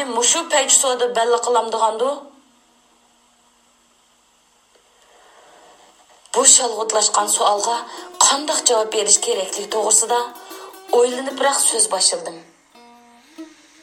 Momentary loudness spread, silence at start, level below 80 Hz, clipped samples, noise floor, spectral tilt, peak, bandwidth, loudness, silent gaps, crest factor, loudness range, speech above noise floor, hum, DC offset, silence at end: 12 LU; 0 s; -74 dBFS; under 0.1%; -57 dBFS; 1 dB/octave; 0 dBFS; 19.5 kHz; -16 LUFS; none; 20 dB; 8 LU; 40 dB; none; under 0.1%; 0.35 s